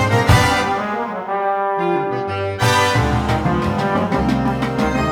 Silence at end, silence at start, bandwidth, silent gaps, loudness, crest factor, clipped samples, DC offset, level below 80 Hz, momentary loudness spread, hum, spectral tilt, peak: 0 s; 0 s; 18 kHz; none; -18 LUFS; 16 dB; under 0.1%; under 0.1%; -32 dBFS; 8 LU; none; -5.5 dB/octave; 0 dBFS